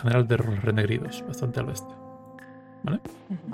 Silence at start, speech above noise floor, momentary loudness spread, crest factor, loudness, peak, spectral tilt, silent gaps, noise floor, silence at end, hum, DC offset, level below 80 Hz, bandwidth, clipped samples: 0 s; 20 dB; 22 LU; 18 dB; -28 LUFS; -10 dBFS; -7 dB/octave; none; -46 dBFS; 0 s; none; under 0.1%; -54 dBFS; 15 kHz; under 0.1%